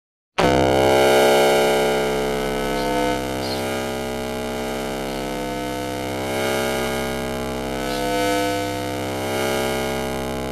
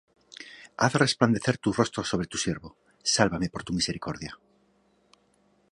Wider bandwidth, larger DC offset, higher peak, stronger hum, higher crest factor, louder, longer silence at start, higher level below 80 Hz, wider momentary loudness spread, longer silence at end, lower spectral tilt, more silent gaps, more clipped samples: first, 16 kHz vs 11.5 kHz; neither; about the same, -2 dBFS vs -4 dBFS; neither; second, 18 dB vs 26 dB; first, -21 LUFS vs -27 LUFS; about the same, 0.4 s vs 0.3 s; first, -40 dBFS vs -54 dBFS; second, 10 LU vs 18 LU; second, 0 s vs 1.35 s; about the same, -4 dB/octave vs -4 dB/octave; neither; neither